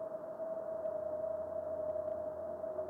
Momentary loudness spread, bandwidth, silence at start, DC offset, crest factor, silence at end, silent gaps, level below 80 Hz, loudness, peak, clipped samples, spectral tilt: 3 LU; 2.2 kHz; 0 s; under 0.1%; 12 dB; 0 s; none; -76 dBFS; -40 LUFS; -28 dBFS; under 0.1%; -8.5 dB/octave